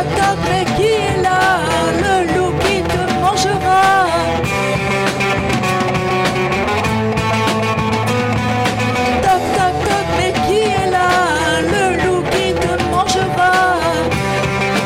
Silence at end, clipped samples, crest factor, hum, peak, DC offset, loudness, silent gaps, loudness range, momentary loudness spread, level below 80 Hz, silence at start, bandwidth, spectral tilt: 0 s; under 0.1%; 12 dB; none; -4 dBFS; under 0.1%; -15 LUFS; none; 2 LU; 3 LU; -34 dBFS; 0 s; 16.5 kHz; -4.5 dB/octave